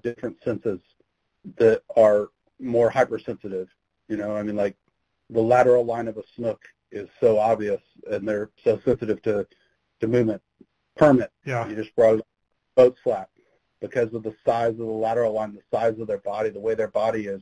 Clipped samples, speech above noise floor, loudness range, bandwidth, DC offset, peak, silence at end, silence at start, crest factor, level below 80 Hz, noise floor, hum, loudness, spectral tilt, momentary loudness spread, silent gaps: under 0.1%; 38 dB; 4 LU; 10 kHz; under 0.1%; -6 dBFS; 0 s; 0.05 s; 18 dB; -58 dBFS; -61 dBFS; none; -23 LUFS; -7.5 dB/octave; 14 LU; none